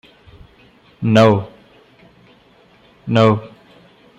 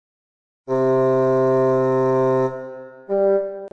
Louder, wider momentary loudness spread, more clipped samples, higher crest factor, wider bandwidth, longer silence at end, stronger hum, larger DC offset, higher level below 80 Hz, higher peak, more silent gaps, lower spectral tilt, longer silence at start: first, -15 LUFS vs -19 LUFS; first, 18 LU vs 9 LU; neither; first, 18 dB vs 10 dB; first, 8.2 kHz vs 6.6 kHz; first, 0.7 s vs 0.05 s; neither; second, under 0.1% vs 0.3%; first, -54 dBFS vs -62 dBFS; first, 0 dBFS vs -10 dBFS; neither; second, -7.5 dB/octave vs -9 dB/octave; first, 1 s vs 0.7 s